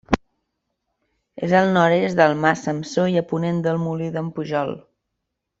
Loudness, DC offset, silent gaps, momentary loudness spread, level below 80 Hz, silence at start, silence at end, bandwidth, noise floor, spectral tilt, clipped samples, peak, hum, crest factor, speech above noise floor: -20 LUFS; under 0.1%; none; 10 LU; -50 dBFS; 0.1 s; 0.8 s; 7.8 kHz; -79 dBFS; -6.5 dB/octave; under 0.1%; -2 dBFS; none; 20 dB; 59 dB